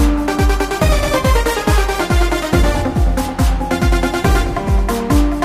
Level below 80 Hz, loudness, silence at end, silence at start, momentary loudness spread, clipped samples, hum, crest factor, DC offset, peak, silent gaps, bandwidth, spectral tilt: -16 dBFS; -16 LUFS; 0 s; 0 s; 2 LU; under 0.1%; none; 12 dB; under 0.1%; -2 dBFS; none; 15.5 kHz; -5.5 dB/octave